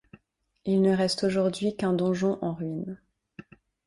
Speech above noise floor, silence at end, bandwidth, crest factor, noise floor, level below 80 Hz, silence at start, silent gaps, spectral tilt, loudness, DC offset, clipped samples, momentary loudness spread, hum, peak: 41 dB; 0.45 s; 11.5 kHz; 16 dB; -67 dBFS; -62 dBFS; 0.65 s; none; -6.5 dB/octave; -27 LUFS; under 0.1%; under 0.1%; 13 LU; none; -12 dBFS